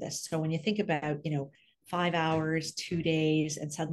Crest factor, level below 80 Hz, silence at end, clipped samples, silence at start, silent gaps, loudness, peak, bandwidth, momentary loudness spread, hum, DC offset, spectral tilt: 16 dB; -66 dBFS; 0 s; under 0.1%; 0 s; none; -31 LUFS; -14 dBFS; 12.5 kHz; 7 LU; none; under 0.1%; -5 dB/octave